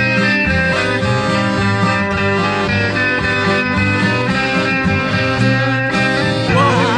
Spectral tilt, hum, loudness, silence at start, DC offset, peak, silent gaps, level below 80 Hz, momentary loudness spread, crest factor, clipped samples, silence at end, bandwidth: -6 dB/octave; none; -14 LUFS; 0 s; under 0.1%; -2 dBFS; none; -36 dBFS; 2 LU; 14 dB; under 0.1%; 0 s; 10.5 kHz